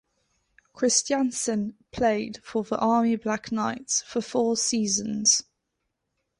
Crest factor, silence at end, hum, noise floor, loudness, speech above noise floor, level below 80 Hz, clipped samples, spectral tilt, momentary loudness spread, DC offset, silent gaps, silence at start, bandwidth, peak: 18 dB; 1 s; none; -80 dBFS; -25 LUFS; 54 dB; -60 dBFS; under 0.1%; -2.5 dB/octave; 8 LU; under 0.1%; none; 0.75 s; 11.5 kHz; -8 dBFS